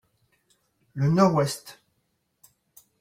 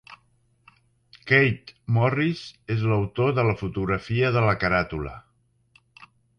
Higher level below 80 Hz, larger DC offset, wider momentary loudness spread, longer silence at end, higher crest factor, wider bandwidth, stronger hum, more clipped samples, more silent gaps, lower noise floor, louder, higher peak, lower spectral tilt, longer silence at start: second, -62 dBFS vs -48 dBFS; neither; first, 21 LU vs 14 LU; first, 1.3 s vs 0.35 s; about the same, 22 dB vs 20 dB; first, 16.5 kHz vs 6.8 kHz; neither; neither; neither; first, -74 dBFS vs -66 dBFS; about the same, -23 LUFS vs -23 LUFS; about the same, -6 dBFS vs -4 dBFS; second, -6.5 dB/octave vs -8 dB/octave; first, 0.95 s vs 0.1 s